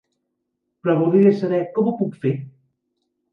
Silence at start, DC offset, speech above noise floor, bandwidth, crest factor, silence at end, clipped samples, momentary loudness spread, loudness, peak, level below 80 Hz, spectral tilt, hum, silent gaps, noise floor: 0.85 s; under 0.1%; 58 dB; 5.6 kHz; 18 dB; 0.85 s; under 0.1%; 10 LU; -20 LUFS; -4 dBFS; -70 dBFS; -10 dB/octave; none; none; -76 dBFS